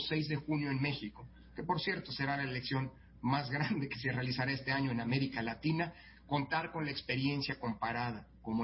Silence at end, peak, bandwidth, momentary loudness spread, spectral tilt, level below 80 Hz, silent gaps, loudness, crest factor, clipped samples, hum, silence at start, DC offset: 0 s; -20 dBFS; 5.8 kHz; 7 LU; -9.5 dB/octave; -60 dBFS; none; -36 LUFS; 16 dB; under 0.1%; none; 0 s; under 0.1%